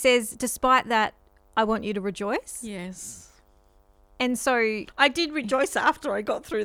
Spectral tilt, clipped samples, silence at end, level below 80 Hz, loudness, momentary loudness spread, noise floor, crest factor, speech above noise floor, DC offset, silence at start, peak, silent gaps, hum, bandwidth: -3 dB/octave; under 0.1%; 0 s; -54 dBFS; -25 LUFS; 14 LU; -59 dBFS; 22 dB; 34 dB; under 0.1%; 0 s; -4 dBFS; none; none; 17 kHz